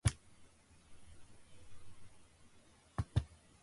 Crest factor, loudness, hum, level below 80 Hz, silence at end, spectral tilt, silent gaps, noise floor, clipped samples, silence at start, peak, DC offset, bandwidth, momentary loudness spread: 26 dB; -42 LUFS; none; -52 dBFS; 0.25 s; -5 dB/octave; none; -65 dBFS; under 0.1%; 0.05 s; -18 dBFS; under 0.1%; 11.5 kHz; 27 LU